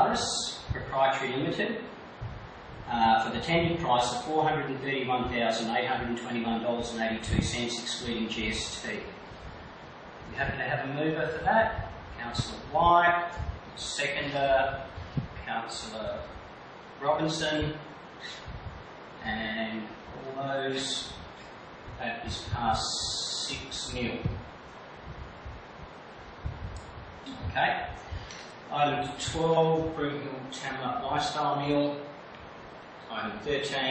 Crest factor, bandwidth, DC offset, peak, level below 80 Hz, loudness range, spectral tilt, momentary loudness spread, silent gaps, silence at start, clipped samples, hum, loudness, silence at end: 20 dB; 8.8 kHz; under 0.1%; -10 dBFS; -48 dBFS; 8 LU; -4 dB/octave; 19 LU; none; 0 s; under 0.1%; none; -30 LUFS; 0 s